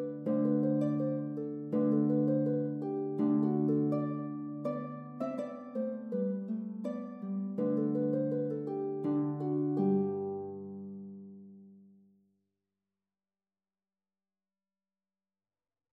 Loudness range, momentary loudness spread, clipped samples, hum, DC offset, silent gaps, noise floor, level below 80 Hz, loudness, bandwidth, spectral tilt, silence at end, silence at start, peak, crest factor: 7 LU; 11 LU; under 0.1%; none; under 0.1%; none; under -90 dBFS; -86 dBFS; -33 LUFS; 3.7 kHz; -11.5 dB/octave; 4.1 s; 0 s; -20 dBFS; 14 dB